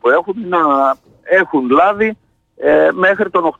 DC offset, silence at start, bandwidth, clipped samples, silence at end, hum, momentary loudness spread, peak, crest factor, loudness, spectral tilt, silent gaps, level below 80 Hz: under 0.1%; 0.05 s; 7.8 kHz; under 0.1%; 0.1 s; none; 6 LU; -2 dBFS; 10 dB; -13 LUFS; -7 dB/octave; none; -54 dBFS